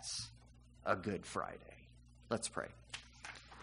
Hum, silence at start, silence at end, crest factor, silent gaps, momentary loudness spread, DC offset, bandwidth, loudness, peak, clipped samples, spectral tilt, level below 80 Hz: 60 Hz at -65 dBFS; 0 s; 0 s; 26 dB; none; 24 LU; under 0.1%; 10.5 kHz; -43 LUFS; -18 dBFS; under 0.1%; -3.5 dB/octave; -64 dBFS